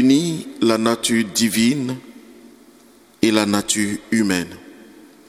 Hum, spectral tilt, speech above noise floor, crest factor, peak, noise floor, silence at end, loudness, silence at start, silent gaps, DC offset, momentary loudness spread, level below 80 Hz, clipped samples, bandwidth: none; -4 dB/octave; 31 dB; 18 dB; -2 dBFS; -50 dBFS; 0.55 s; -19 LUFS; 0 s; none; under 0.1%; 10 LU; -58 dBFS; under 0.1%; 16 kHz